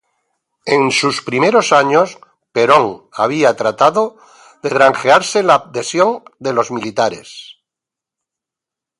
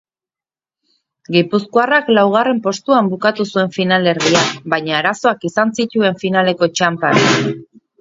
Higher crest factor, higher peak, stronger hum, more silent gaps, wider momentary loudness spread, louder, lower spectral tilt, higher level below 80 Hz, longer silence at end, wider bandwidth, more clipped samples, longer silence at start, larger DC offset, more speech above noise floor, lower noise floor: about the same, 16 dB vs 16 dB; about the same, 0 dBFS vs 0 dBFS; neither; neither; first, 11 LU vs 5 LU; about the same, -14 LUFS vs -15 LUFS; about the same, -4 dB/octave vs -4.5 dB/octave; about the same, -62 dBFS vs -60 dBFS; first, 1.45 s vs 0.35 s; first, 11.5 kHz vs 7.8 kHz; neither; second, 0.65 s vs 1.3 s; neither; second, 71 dB vs over 75 dB; second, -85 dBFS vs under -90 dBFS